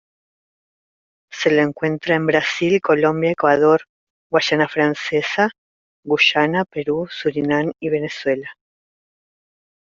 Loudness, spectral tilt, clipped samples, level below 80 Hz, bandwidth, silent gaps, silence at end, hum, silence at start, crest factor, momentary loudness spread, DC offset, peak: -18 LUFS; -5.5 dB/octave; under 0.1%; -60 dBFS; 7.4 kHz; 3.89-4.30 s, 5.58-6.03 s; 1.3 s; none; 1.3 s; 18 dB; 8 LU; under 0.1%; -2 dBFS